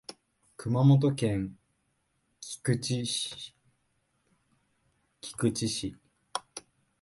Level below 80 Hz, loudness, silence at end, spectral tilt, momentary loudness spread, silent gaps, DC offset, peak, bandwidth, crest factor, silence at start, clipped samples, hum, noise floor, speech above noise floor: -60 dBFS; -29 LUFS; 0.4 s; -5.5 dB/octave; 23 LU; none; under 0.1%; -10 dBFS; 11.5 kHz; 22 dB; 0.1 s; under 0.1%; none; -75 dBFS; 47 dB